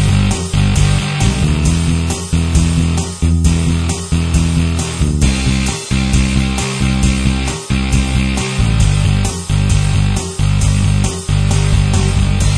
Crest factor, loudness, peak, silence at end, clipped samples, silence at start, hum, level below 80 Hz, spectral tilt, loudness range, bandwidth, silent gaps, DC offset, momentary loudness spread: 12 dB; -15 LUFS; 0 dBFS; 0 s; under 0.1%; 0 s; none; -18 dBFS; -5 dB/octave; 1 LU; 11 kHz; none; under 0.1%; 4 LU